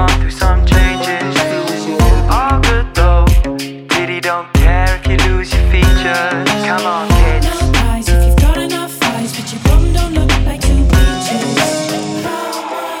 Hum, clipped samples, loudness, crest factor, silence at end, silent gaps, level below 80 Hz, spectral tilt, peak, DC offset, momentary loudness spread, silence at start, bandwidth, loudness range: none; under 0.1%; -13 LUFS; 10 dB; 0 s; none; -14 dBFS; -5 dB/octave; 0 dBFS; under 0.1%; 7 LU; 0 s; 16 kHz; 1 LU